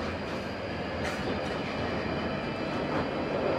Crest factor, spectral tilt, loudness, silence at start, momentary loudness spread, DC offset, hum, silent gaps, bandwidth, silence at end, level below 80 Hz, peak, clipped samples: 16 dB; -6 dB/octave; -32 LUFS; 0 s; 4 LU; under 0.1%; none; none; 14.5 kHz; 0 s; -50 dBFS; -16 dBFS; under 0.1%